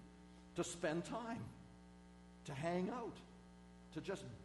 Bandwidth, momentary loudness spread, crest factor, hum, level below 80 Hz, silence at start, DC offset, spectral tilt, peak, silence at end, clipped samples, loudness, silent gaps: 11.5 kHz; 20 LU; 18 dB; 60 Hz at -60 dBFS; -68 dBFS; 0 s; under 0.1%; -5.5 dB/octave; -30 dBFS; 0 s; under 0.1%; -46 LUFS; none